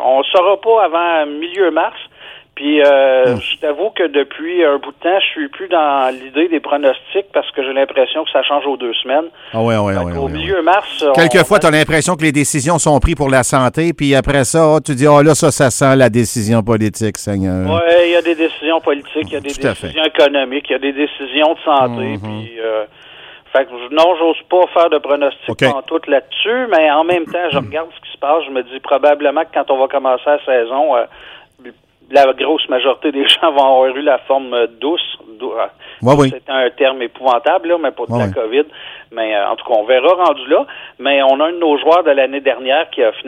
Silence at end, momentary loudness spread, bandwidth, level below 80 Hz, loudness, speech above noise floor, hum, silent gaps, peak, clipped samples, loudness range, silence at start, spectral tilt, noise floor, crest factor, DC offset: 0 s; 9 LU; 16 kHz; -36 dBFS; -14 LUFS; 26 dB; none; none; 0 dBFS; under 0.1%; 4 LU; 0 s; -4.5 dB/octave; -40 dBFS; 14 dB; under 0.1%